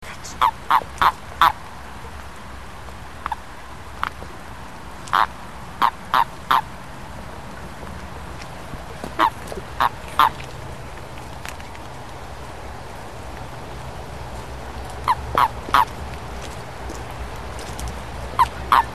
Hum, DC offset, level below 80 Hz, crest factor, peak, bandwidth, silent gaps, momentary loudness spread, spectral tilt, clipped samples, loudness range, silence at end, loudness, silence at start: none; 1%; -40 dBFS; 26 dB; 0 dBFS; 13 kHz; none; 18 LU; -4 dB/octave; under 0.1%; 11 LU; 0 s; -23 LUFS; 0 s